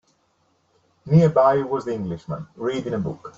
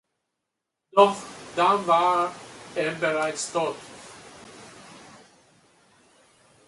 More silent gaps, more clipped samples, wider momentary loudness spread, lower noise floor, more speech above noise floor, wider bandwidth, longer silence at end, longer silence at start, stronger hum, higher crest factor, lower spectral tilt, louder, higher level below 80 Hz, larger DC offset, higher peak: neither; neither; second, 13 LU vs 25 LU; second, -66 dBFS vs -83 dBFS; second, 45 dB vs 61 dB; second, 7.6 kHz vs 11.5 kHz; second, 0.1 s vs 1.7 s; about the same, 1.05 s vs 0.95 s; neither; second, 18 dB vs 24 dB; first, -8.5 dB/octave vs -3.5 dB/octave; first, -21 LUFS vs -24 LUFS; first, -56 dBFS vs -70 dBFS; neither; about the same, -4 dBFS vs -4 dBFS